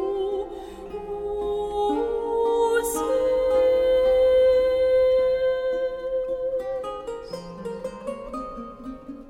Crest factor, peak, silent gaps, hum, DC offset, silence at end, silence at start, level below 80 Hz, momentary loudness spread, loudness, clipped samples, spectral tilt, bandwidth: 12 dB; -12 dBFS; none; none; under 0.1%; 0 s; 0 s; -46 dBFS; 16 LU; -23 LUFS; under 0.1%; -4.5 dB/octave; 16 kHz